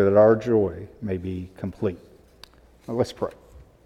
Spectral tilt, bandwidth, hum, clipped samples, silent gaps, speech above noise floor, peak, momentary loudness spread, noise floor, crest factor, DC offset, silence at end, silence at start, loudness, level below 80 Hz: -8 dB/octave; 11.5 kHz; none; under 0.1%; none; 29 dB; -4 dBFS; 17 LU; -51 dBFS; 20 dB; under 0.1%; 0.25 s; 0 s; -24 LUFS; -52 dBFS